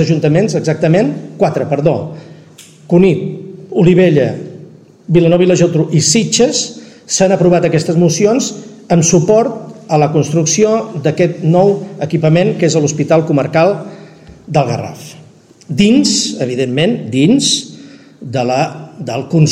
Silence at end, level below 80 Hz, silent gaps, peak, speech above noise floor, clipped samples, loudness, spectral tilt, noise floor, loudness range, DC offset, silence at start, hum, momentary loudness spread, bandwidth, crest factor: 0 s; -48 dBFS; none; 0 dBFS; 29 dB; under 0.1%; -12 LUFS; -5 dB/octave; -40 dBFS; 3 LU; under 0.1%; 0 s; none; 12 LU; 12 kHz; 12 dB